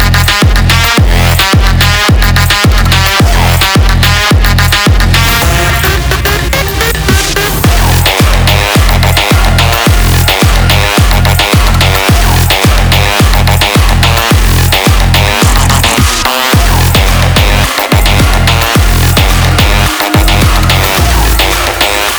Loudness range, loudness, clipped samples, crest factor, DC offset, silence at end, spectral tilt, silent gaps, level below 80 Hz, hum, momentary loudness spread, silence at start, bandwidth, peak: 1 LU; -7 LUFS; 0.2%; 6 dB; 0.5%; 0 s; -4 dB/octave; none; -12 dBFS; none; 2 LU; 0 s; over 20 kHz; 0 dBFS